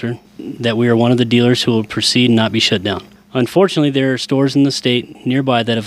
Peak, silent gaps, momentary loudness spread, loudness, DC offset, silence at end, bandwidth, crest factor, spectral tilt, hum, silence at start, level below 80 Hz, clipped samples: 0 dBFS; none; 9 LU; -14 LUFS; under 0.1%; 0 s; 14.5 kHz; 14 dB; -5.5 dB/octave; none; 0 s; -56 dBFS; under 0.1%